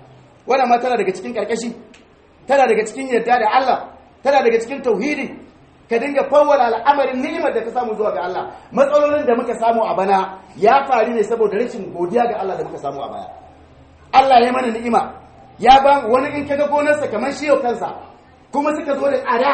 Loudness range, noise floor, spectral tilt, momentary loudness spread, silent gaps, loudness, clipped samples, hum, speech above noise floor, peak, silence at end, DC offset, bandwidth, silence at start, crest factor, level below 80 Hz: 3 LU; -48 dBFS; -4.5 dB/octave; 12 LU; none; -17 LUFS; under 0.1%; none; 31 dB; 0 dBFS; 0 s; under 0.1%; 8.8 kHz; 0.45 s; 18 dB; -50 dBFS